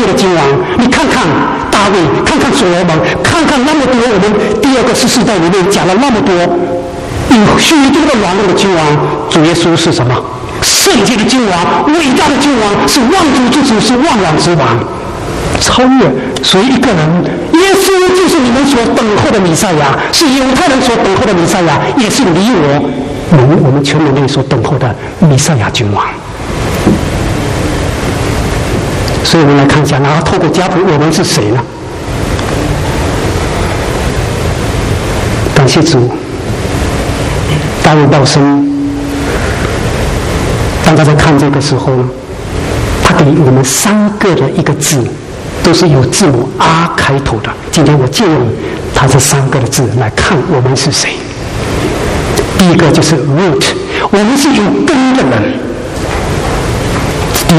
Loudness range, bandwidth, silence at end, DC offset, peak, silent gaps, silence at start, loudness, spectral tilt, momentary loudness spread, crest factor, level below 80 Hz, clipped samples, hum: 3 LU; 15.5 kHz; 0 s; under 0.1%; 0 dBFS; none; 0 s; -9 LUFS; -5 dB/octave; 7 LU; 8 dB; -24 dBFS; 0.3%; none